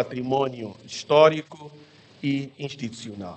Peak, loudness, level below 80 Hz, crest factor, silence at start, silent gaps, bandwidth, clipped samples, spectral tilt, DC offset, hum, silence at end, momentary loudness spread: -4 dBFS; -24 LUFS; -68 dBFS; 22 dB; 0 s; none; 8.8 kHz; under 0.1%; -5.5 dB/octave; under 0.1%; none; 0 s; 19 LU